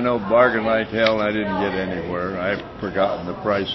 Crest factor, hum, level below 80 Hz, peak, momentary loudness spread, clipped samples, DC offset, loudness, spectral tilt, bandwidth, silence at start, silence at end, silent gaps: 18 dB; none; -46 dBFS; -2 dBFS; 9 LU; under 0.1%; under 0.1%; -21 LUFS; -7 dB/octave; 6 kHz; 0 s; 0 s; none